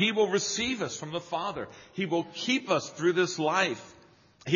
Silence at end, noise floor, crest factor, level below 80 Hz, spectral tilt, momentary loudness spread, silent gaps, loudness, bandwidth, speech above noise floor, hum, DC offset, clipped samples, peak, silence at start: 0 s; -56 dBFS; 18 dB; -66 dBFS; -3 dB/octave; 10 LU; none; -29 LUFS; 7.4 kHz; 27 dB; none; under 0.1%; under 0.1%; -10 dBFS; 0 s